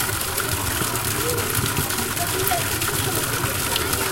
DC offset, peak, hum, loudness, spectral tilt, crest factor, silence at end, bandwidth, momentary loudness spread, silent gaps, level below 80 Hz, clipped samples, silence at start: under 0.1%; -2 dBFS; none; -21 LUFS; -2.5 dB/octave; 20 dB; 0 s; 17.5 kHz; 2 LU; none; -40 dBFS; under 0.1%; 0 s